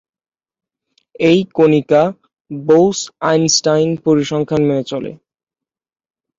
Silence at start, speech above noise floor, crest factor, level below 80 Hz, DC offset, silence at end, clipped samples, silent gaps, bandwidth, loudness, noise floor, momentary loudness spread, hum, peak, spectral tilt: 1.2 s; 73 dB; 16 dB; -54 dBFS; under 0.1%; 1.25 s; under 0.1%; 2.41-2.45 s; 7.8 kHz; -14 LUFS; -87 dBFS; 12 LU; none; 0 dBFS; -5 dB/octave